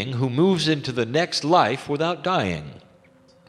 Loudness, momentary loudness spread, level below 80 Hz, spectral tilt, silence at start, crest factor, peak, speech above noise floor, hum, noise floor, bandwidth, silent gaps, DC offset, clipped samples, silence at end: -22 LUFS; 7 LU; -56 dBFS; -5.5 dB/octave; 0 s; 20 dB; -4 dBFS; 33 dB; none; -54 dBFS; 13 kHz; none; under 0.1%; under 0.1%; 0.7 s